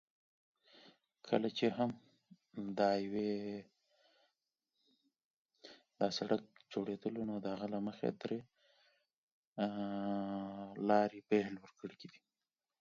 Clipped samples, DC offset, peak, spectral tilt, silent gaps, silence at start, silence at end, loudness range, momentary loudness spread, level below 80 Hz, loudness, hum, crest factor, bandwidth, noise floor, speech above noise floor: under 0.1%; under 0.1%; -16 dBFS; -5 dB/octave; 5.24-5.49 s, 9.14-9.56 s; 0.85 s; 0.7 s; 5 LU; 18 LU; -80 dBFS; -39 LUFS; none; 24 dB; 7.2 kHz; under -90 dBFS; over 52 dB